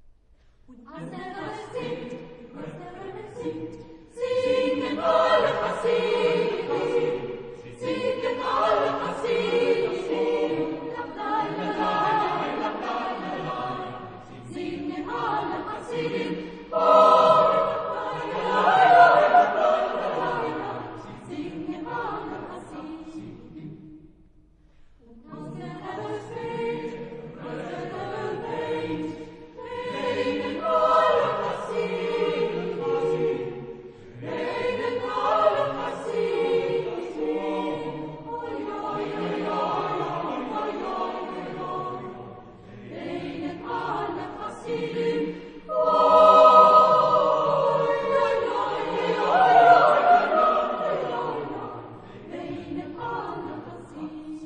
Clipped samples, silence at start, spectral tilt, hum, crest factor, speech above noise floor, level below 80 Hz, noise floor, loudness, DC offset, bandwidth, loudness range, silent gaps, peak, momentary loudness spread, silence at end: under 0.1%; 0.7 s; -6 dB/octave; none; 22 dB; 22 dB; -56 dBFS; -57 dBFS; -23 LUFS; under 0.1%; 9.6 kHz; 17 LU; none; -2 dBFS; 21 LU; 0 s